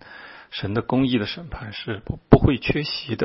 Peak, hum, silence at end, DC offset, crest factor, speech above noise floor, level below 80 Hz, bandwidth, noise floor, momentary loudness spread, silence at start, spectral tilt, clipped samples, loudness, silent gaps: 0 dBFS; none; 0 s; under 0.1%; 22 dB; 21 dB; -36 dBFS; 5.8 kHz; -43 dBFS; 17 LU; 0.1 s; -10.5 dB/octave; under 0.1%; -22 LUFS; none